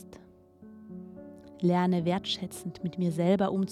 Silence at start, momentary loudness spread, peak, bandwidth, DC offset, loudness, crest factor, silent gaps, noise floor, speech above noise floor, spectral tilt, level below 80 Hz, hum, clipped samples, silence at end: 0 s; 22 LU; -14 dBFS; 13.5 kHz; under 0.1%; -29 LUFS; 18 dB; none; -54 dBFS; 26 dB; -6.5 dB/octave; -66 dBFS; none; under 0.1%; 0 s